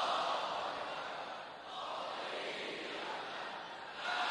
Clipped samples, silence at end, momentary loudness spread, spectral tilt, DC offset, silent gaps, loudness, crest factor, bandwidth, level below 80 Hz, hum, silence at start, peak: under 0.1%; 0 s; 9 LU; -2 dB/octave; under 0.1%; none; -41 LUFS; 18 dB; 12 kHz; -82 dBFS; none; 0 s; -24 dBFS